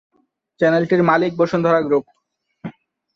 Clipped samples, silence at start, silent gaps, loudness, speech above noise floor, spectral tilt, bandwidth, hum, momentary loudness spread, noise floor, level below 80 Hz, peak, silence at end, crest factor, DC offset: under 0.1%; 0.6 s; none; -17 LUFS; 31 dB; -8 dB/octave; 7.2 kHz; none; 20 LU; -47 dBFS; -60 dBFS; -4 dBFS; 0.45 s; 16 dB; under 0.1%